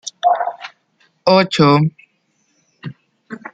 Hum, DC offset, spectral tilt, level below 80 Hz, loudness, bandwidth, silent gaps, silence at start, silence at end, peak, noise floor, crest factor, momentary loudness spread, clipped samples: none; under 0.1%; -6 dB/octave; -60 dBFS; -15 LUFS; 9 kHz; none; 0.05 s; 0.05 s; 0 dBFS; -64 dBFS; 18 dB; 22 LU; under 0.1%